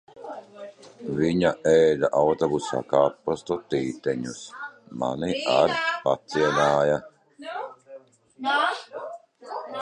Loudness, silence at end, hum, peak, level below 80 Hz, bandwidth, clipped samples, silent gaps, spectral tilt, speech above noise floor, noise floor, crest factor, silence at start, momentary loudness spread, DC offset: -24 LUFS; 0 s; none; -6 dBFS; -58 dBFS; 10 kHz; under 0.1%; none; -5 dB/octave; 24 dB; -48 dBFS; 18 dB; 0.15 s; 19 LU; under 0.1%